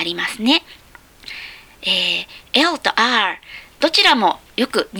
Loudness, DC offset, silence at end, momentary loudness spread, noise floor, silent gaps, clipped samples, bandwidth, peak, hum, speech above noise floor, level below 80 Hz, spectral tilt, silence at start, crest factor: -16 LUFS; under 0.1%; 0 s; 19 LU; -39 dBFS; none; under 0.1%; over 20 kHz; 0 dBFS; none; 21 dB; -56 dBFS; -2.5 dB/octave; 0 s; 20 dB